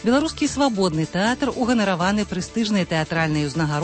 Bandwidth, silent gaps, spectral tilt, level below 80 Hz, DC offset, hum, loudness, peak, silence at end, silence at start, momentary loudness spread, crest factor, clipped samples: 8.8 kHz; none; -5 dB/octave; -44 dBFS; under 0.1%; none; -21 LUFS; -8 dBFS; 0 s; 0 s; 3 LU; 14 dB; under 0.1%